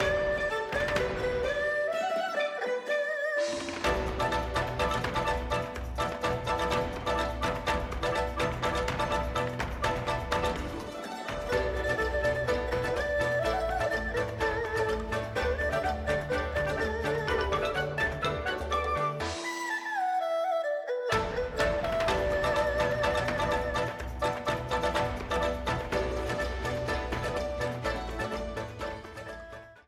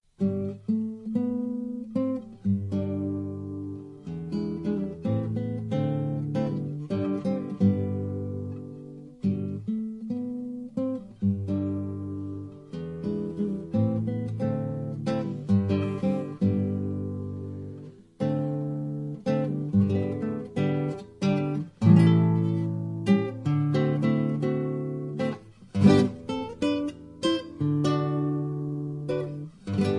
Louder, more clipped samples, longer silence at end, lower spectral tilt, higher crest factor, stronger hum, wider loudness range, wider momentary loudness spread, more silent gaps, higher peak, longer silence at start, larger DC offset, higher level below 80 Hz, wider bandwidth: about the same, -30 LUFS vs -28 LUFS; neither; about the same, 0.05 s vs 0 s; second, -5 dB/octave vs -8.5 dB/octave; second, 16 dB vs 22 dB; neither; second, 2 LU vs 7 LU; second, 5 LU vs 11 LU; neither; second, -14 dBFS vs -6 dBFS; second, 0 s vs 0.2 s; neither; first, -42 dBFS vs -62 dBFS; first, 16 kHz vs 11 kHz